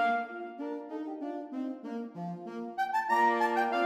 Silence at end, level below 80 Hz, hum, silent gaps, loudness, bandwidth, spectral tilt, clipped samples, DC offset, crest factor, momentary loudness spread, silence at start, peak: 0 s; -82 dBFS; none; none; -33 LUFS; 15.5 kHz; -5.5 dB/octave; under 0.1%; under 0.1%; 16 dB; 13 LU; 0 s; -16 dBFS